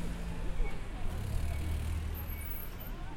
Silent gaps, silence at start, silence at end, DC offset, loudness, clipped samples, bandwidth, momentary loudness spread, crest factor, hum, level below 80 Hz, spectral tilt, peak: none; 0 s; 0 s; under 0.1%; -39 LUFS; under 0.1%; 16.5 kHz; 5 LU; 16 dB; none; -38 dBFS; -6 dB/octave; -20 dBFS